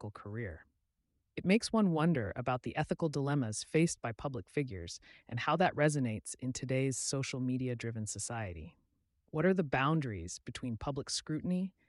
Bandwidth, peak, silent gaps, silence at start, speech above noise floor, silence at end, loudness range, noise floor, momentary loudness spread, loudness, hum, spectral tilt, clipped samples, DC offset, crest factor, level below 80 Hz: 11.5 kHz; -18 dBFS; none; 0 s; 47 dB; 0.2 s; 3 LU; -81 dBFS; 13 LU; -35 LUFS; none; -5.5 dB/octave; under 0.1%; under 0.1%; 16 dB; -62 dBFS